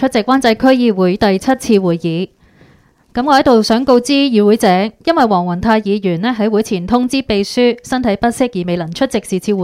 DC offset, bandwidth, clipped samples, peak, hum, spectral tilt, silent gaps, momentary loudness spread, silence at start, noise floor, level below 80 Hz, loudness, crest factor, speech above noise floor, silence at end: under 0.1%; 15.5 kHz; under 0.1%; 0 dBFS; none; -5.5 dB/octave; none; 7 LU; 0 s; -49 dBFS; -42 dBFS; -13 LUFS; 14 dB; 36 dB; 0 s